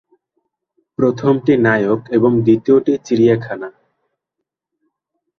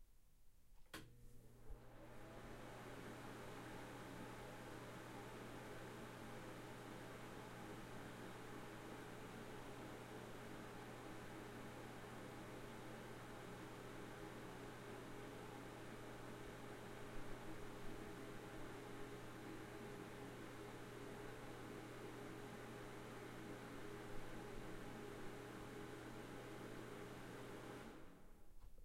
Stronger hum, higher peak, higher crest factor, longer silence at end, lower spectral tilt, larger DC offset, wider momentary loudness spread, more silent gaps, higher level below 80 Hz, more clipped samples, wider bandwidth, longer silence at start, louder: neither; first, -2 dBFS vs -36 dBFS; about the same, 16 dB vs 18 dB; first, 1.7 s vs 0 s; first, -8 dB/octave vs -5 dB/octave; neither; first, 14 LU vs 2 LU; neither; first, -56 dBFS vs -66 dBFS; neither; second, 6.8 kHz vs 16 kHz; first, 1 s vs 0 s; first, -15 LUFS vs -55 LUFS